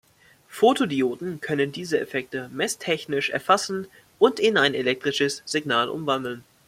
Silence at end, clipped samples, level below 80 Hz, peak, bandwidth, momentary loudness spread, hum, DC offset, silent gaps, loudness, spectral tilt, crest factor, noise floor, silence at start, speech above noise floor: 0.25 s; under 0.1%; -66 dBFS; -4 dBFS; 16 kHz; 10 LU; none; under 0.1%; none; -24 LUFS; -3.5 dB/octave; 20 dB; -56 dBFS; 0.5 s; 32 dB